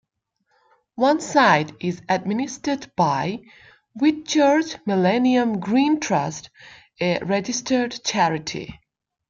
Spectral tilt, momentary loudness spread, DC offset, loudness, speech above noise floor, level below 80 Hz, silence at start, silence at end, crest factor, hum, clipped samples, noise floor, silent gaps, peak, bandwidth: -4.5 dB/octave; 11 LU; under 0.1%; -21 LUFS; 52 dB; -60 dBFS; 0.95 s; 0.55 s; 20 dB; none; under 0.1%; -73 dBFS; none; -2 dBFS; 7.8 kHz